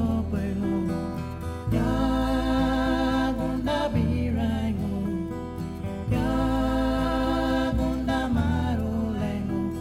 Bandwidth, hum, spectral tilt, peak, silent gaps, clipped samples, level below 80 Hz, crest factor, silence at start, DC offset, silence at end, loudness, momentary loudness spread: 15.5 kHz; none; -7.5 dB/octave; -12 dBFS; none; under 0.1%; -34 dBFS; 12 dB; 0 s; under 0.1%; 0 s; -26 LUFS; 8 LU